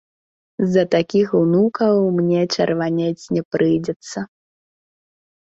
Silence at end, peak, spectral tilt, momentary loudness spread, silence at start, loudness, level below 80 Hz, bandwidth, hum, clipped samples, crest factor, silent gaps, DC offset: 1.15 s; -2 dBFS; -6.5 dB/octave; 12 LU; 0.6 s; -18 LUFS; -60 dBFS; 8 kHz; none; under 0.1%; 16 dB; 3.45-3.51 s, 3.96-4.00 s; under 0.1%